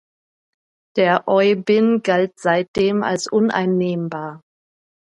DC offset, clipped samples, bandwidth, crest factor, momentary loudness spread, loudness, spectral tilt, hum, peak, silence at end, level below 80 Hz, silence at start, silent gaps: under 0.1%; under 0.1%; 11 kHz; 18 dB; 10 LU; -18 LUFS; -6 dB/octave; none; -2 dBFS; 0.75 s; -58 dBFS; 0.95 s; 2.68-2.74 s